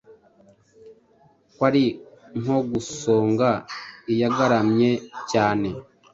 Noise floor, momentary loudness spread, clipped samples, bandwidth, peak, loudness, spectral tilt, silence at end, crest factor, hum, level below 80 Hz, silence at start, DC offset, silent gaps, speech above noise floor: -58 dBFS; 14 LU; under 0.1%; 7.8 kHz; -4 dBFS; -22 LUFS; -6 dB/octave; 0.3 s; 20 dB; none; -58 dBFS; 0.1 s; under 0.1%; none; 37 dB